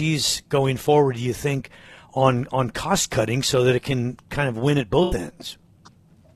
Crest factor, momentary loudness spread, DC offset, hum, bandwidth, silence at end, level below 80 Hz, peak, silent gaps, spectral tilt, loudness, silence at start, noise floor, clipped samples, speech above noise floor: 20 dB; 11 LU; under 0.1%; none; 13.5 kHz; 0.8 s; -44 dBFS; -4 dBFS; none; -5 dB/octave; -22 LUFS; 0 s; -52 dBFS; under 0.1%; 31 dB